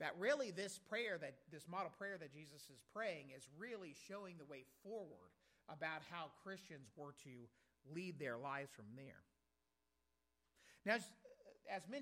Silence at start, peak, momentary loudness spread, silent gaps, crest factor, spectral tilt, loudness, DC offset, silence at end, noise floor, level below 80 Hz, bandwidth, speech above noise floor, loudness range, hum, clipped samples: 0 s; -26 dBFS; 18 LU; none; 24 dB; -4 dB/octave; -49 LUFS; under 0.1%; 0 s; -88 dBFS; under -90 dBFS; 16 kHz; 39 dB; 5 LU; none; under 0.1%